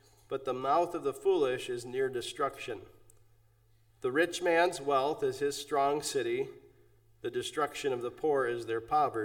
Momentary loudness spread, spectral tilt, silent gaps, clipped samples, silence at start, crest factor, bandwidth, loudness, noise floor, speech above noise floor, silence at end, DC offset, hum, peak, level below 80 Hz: 10 LU; -4 dB/octave; none; under 0.1%; 0.3 s; 18 dB; 17.5 kHz; -32 LUFS; -65 dBFS; 34 dB; 0 s; under 0.1%; none; -14 dBFS; -68 dBFS